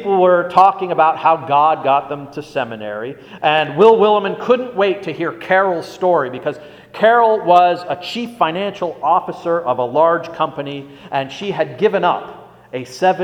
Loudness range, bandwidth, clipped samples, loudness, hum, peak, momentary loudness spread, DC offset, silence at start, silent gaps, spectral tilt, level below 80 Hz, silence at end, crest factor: 4 LU; 11.5 kHz; under 0.1%; -16 LUFS; none; 0 dBFS; 15 LU; under 0.1%; 0 s; none; -6 dB/octave; -60 dBFS; 0 s; 16 dB